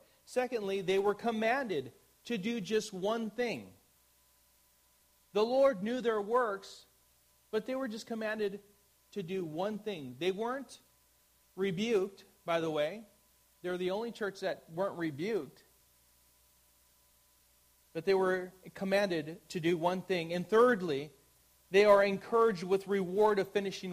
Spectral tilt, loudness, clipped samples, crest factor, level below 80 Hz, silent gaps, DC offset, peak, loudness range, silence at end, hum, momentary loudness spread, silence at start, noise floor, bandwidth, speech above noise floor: -5.5 dB/octave; -33 LUFS; under 0.1%; 22 dB; -74 dBFS; none; under 0.1%; -12 dBFS; 9 LU; 0 s; 60 Hz at -70 dBFS; 14 LU; 0.3 s; -69 dBFS; 15.5 kHz; 36 dB